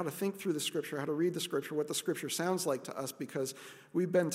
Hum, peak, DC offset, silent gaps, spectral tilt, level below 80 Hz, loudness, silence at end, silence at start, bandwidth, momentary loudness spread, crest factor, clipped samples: none; -18 dBFS; under 0.1%; none; -4 dB/octave; -86 dBFS; -35 LUFS; 0 s; 0 s; 16 kHz; 7 LU; 16 dB; under 0.1%